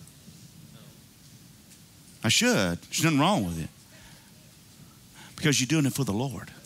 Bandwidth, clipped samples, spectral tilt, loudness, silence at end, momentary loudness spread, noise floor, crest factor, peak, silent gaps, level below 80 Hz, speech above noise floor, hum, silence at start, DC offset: 16 kHz; under 0.1%; -4 dB/octave; -25 LUFS; 0.05 s; 15 LU; -53 dBFS; 20 dB; -10 dBFS; none; -58 dBFS; 27 dB; none; 0 s; under 0.1%